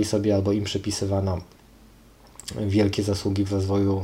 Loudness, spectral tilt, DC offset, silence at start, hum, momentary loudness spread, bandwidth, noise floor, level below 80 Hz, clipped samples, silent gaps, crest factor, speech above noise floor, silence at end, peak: -24 LUFS; -6 dB/octave; under 0.1%; 0 s; none; 9 LU; 15.5 kHz; -51 dBFS; -52 dBFS; under 0.1%; none; 16 dB; 28 dB; 0 s; -8 dBFS